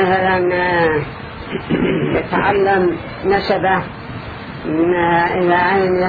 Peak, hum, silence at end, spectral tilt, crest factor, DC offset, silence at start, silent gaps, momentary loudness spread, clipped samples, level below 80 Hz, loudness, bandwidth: 0 dBFS; none; 0 s; -9 dB/octave; 16 dB; under 0.1%; 0 s; none; 14 LU; under 0.1%; -40 dBFS; -16 LUFS; 4.9 kHz